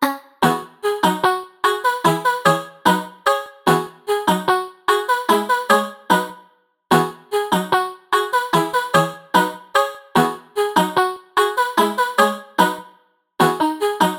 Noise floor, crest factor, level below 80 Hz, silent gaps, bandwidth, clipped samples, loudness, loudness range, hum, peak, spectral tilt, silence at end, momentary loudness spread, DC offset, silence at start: -55 dBFS; 18 dB; -60 dBFS; none; 19 kHz; under 0.1%; -19 LUFS; 1 LU; none; 0 dBFS; -4 dB/octave; 0 s; 3 LU; under 0.1%; 0 s